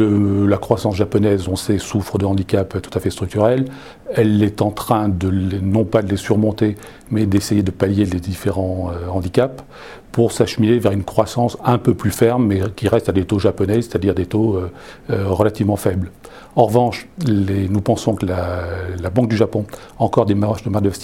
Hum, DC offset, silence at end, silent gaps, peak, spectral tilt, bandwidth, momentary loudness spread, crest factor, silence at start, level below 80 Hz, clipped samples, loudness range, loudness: none; 0.3%; 0 s; none; 0 dBFS; -7 dB/octave; 16.5 kHz; 8 LU; 18 dB; 0 s; -42 dBFS; under 0.1%; 2 LU; -18 LUFS